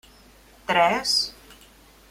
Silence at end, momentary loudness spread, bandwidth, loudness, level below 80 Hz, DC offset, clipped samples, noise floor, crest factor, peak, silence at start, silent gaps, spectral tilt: 0.55 s; 12 LU; 16.5 kHz; -22 LUFS; -56 dBFS; under 0.1%; under 0.1%; -52 dBFS; 22 dB; -6 dBFS; 0.7 s; none; -2 dB/octave